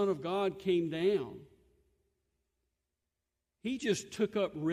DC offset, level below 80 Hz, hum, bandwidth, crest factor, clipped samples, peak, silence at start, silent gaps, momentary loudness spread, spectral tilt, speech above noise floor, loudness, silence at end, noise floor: under 0.1%; -72 dBFS; none; 14 kHz; 16 dB; under 0.1%; -18 dBFS; 0 s; none; 10 LU; -5.5 dB/octave; 55 dB; -34 LUFS; 0 s; -88 dBFS